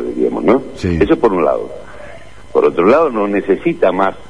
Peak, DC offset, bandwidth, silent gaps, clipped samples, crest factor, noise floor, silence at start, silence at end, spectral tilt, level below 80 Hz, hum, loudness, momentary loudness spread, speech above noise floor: 0 dBFS; 2%; 10.5 kHz; none; under 0.1%; 14 dB; -36 dBFS; 0 s; 0.1 s; -7.5 dB/octave; -38 dBFS; none; -14 LUFS; 13 LU; 23 dB